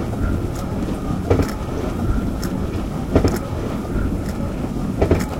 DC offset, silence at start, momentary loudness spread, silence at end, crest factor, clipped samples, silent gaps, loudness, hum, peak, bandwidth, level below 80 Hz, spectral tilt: under 0.1%; 0 s; 6 LU; 0 s; 20 dB; under 0.1%; none; -22 LUFS; none; 0 dBFS; 16.5 kHz; -28 dBFS; -7.5 dB/octave